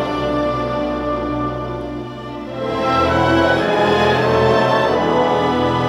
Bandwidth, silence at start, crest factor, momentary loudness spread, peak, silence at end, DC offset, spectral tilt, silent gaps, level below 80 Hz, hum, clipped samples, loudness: 14 kHz; 0 s; 16 dB; 11 LU; -2 dBFS; 0 s; under 0.1%; -6.5 dB/octave; none; -38 dBFS; none; under 0.1%; -17 LUFS